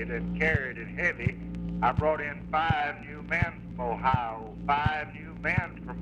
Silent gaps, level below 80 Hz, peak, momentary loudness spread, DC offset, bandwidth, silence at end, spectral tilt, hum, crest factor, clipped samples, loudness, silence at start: none; -44 dBFS; -12 dBFS; 9 LU; under 0.1%; 8.2 kHz; 0 s; -7.5 dB/octave; none; 18 dB; under 0.1%; -29 LUFS; 0 s